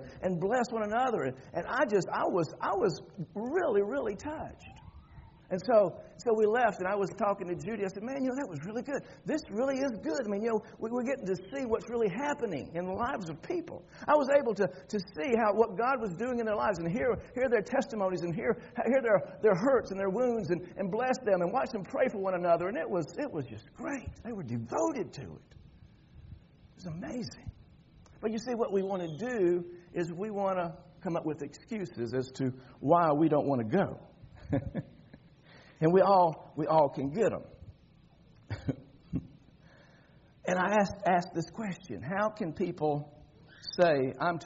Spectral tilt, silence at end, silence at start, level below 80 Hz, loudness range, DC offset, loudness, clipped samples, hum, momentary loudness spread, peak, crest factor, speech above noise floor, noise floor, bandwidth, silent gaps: -5.5 dB/octave; 0 s; 0 s; -62 dBFS; 8 LU; under 0.1%; -31 LUFS; under 0.1%; none; 13 LU; -12 dBFS; 20 dB; 29 dB; -60 dBFS; 7.6 kHz; none